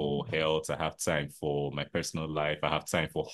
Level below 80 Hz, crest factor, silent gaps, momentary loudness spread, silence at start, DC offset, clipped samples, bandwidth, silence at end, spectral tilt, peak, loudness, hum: -54 dBFS; 20 dB; none; 4 LU; 0 s; under 0.1%; under 0.1%; 12.5 kHz; 0 s; -4.5 dB/octave; -12 dBFS; -32 LUFS; none